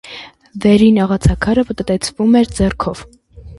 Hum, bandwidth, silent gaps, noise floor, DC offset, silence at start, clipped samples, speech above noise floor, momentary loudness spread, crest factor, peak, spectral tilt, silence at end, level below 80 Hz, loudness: none; 11.5 kHz; none; -35 dBFS; under 0.1%; 0.05 s; under 0.1%; 22 dB; 21 LU; 14 dB; 0 dBFS; -6.5 dB/octave; 0.05 s; -28 dBFS; -14 LUFS